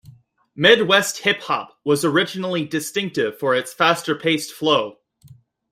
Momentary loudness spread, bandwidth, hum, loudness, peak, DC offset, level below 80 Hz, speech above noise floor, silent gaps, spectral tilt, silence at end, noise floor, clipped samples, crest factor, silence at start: 9 LU; 16 kHz; none; -19 LUFS; -2 dBFS; under 0.1%; -64 dBFS; 30 dB; none; -3.5 dB/octave; 0.4 s; -49 dBFS; under 0.1%; 20 dB; 0.1 s